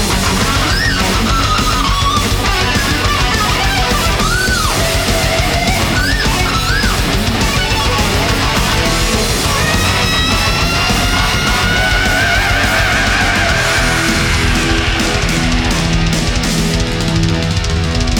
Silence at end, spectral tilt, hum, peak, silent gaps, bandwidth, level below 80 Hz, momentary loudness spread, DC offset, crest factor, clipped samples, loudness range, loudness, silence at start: 0 s; -3.5 dB/octave; none; -2 dBFS; none; over 20 kHz; -20 dBFS; 2 LU; under 0.1%; 12 dB; under 0.1%; 1 LU; -13 LUFS; 0 s